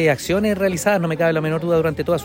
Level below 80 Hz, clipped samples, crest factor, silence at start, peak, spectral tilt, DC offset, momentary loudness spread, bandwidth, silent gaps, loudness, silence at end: -48 dBFS; under 0.1%; 14 dB; 0 s; -4 dBFS; -5.5 dB/octave; under 0.1%; 2 LU; 16.5 kHz; none; -19 LUFS; 0 s